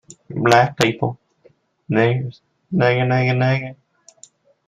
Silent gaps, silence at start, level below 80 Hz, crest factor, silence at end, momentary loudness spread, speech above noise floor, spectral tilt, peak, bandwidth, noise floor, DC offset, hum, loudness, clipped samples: none; 0.3 s; -54 dBFS; 20 dB; 0.95 s; 16 LU; 39 dB; -6 dB/octave; 0 dBFS; 14.5 kHz; -56 dBFS; under 0.1%; none; -18 LUFS; under 0.1%